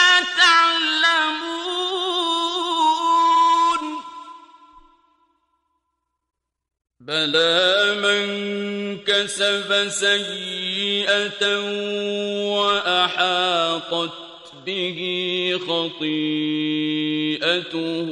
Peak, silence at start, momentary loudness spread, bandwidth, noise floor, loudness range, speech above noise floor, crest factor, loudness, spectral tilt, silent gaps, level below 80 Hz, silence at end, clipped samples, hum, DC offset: -2 dBFS; 0 s; 10 LU; 11.5 kHz; -77 dBFS; 5 LU; 55 dB; 20 dB; -19 LUFS; -2.5 dB/octave; none; -66 dBFS; 0 s; under 0.1%; none; under 0.1%